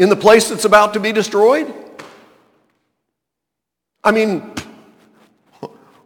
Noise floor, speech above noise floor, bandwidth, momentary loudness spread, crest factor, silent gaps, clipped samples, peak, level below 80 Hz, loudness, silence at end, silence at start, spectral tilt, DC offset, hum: -81 dBFS; 69 dB; 18.5 kHz; 25 LU; 16 dB; none; under 0.1%; 0 dBFS; -54 dBFS; -13 LUFS; 0.4 s; 0 s; -4 dB/octave; under 0.1%; none